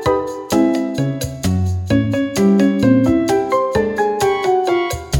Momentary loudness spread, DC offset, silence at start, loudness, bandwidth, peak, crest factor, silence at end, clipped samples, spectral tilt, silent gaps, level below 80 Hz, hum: 7 LU; under 0.1%; 0 s; -16 LUFS; 18 kHz; -2 dBFS; 14 dB; 0 s; under 0.1%; -6.5 dB/octave; none; -38 dBFS; none